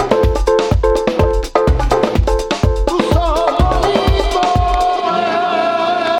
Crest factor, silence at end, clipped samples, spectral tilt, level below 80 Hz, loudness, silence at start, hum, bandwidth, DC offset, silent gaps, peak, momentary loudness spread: 14 dB; 0 s; under 0.1%; -6 dB/octave; -20 dBFS; -15 LUFS; 0 s; none; 13.5 kHz; under 0.1%; none; 0 dBFS; 2 LU